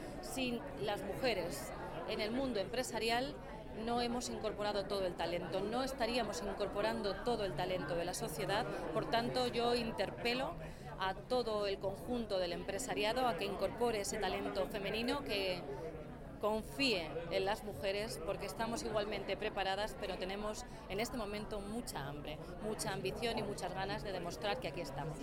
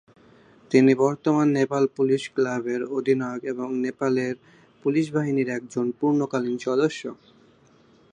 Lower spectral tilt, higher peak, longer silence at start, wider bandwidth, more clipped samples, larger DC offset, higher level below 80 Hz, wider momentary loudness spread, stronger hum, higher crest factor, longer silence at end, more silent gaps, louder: second, -4 dB/octave vs -6.5 dB/octave; second, -20 dBFS vs -4 dBFS; second, 0 s vs 0.7 s; first, 17 kHz vs 10 kHz; neither; neither; first, -54 dBFS vs -72 dBFS; about the same, 8 LU vs 9 LU; neither; about the same, 18 dB vs 20 dB; second, 0 s vs 1 s; neither; second, -39 LUFS vs -24 LUFS